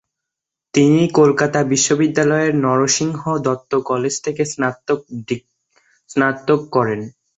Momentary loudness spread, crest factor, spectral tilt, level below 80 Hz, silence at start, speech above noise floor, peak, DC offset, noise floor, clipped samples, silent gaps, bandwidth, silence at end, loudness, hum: 9 LU; 16 dB; -4.5 dB/octave; -58 dBFS; 0.75 s; 67 dB; -2 dBFS; under 0.1%; -84 dBFS; under 0.1%; none; 8.2 kHz; 0.3 s; -17 LUFS; none